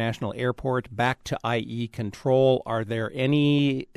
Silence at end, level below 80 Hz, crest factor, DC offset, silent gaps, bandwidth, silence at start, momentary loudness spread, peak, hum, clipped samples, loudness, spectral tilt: 0.15 s; -54 dBFS; 16 dB; under 0.1%; none; 13 kHz; 0 s; 9 LU; -10 dBFS; none; under 0.1%; -25 LUFS; -7 dB/octave